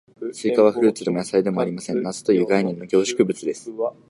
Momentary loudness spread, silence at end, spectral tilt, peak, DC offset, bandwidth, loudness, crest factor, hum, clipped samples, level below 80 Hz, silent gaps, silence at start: 10 LU; 0.2 s; -5.5 dB/octave; -4 dBFS; under 0.1%; 11.5 kHz; -21 LUFS; 18 dB; none; under 0.1%; -66 dBFS; none; 0.2 s